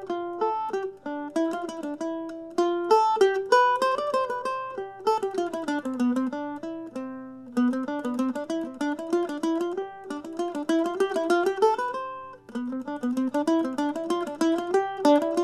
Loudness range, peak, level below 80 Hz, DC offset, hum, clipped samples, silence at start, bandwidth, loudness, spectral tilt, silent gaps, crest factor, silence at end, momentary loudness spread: 5 LU; -6 dBFS; -70 dBFS; under 0.1%; none; under 0.1%; 0 s; 13 kHz; -27 LUFS; -4 dB/octave; none; 20 dB; 0 s; 13 LU